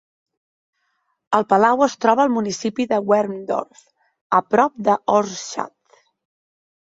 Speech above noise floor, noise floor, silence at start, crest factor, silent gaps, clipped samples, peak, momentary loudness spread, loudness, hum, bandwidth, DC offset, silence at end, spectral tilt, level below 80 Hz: 52 dB; -70 dBFS; 1.3 s; 20 dB; 4.21-4.30 s; under 0.1%; 0 dBFS; 11 LU; -19 LUFS; none; 7.8 kHz; under 0.1%; 1.2 s; -4.5 dB/octave; -66 dBFS